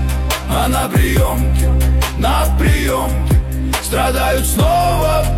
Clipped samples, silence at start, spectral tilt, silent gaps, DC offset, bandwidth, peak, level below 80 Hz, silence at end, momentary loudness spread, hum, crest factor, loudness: under 0.1%; 0 s; -5 dB/octave; none; under 0.1%; 16.5 kHz; -2 dBFS; -16 dBFS; 0 s; 4 LU; none; 12 dB; -15 LUFS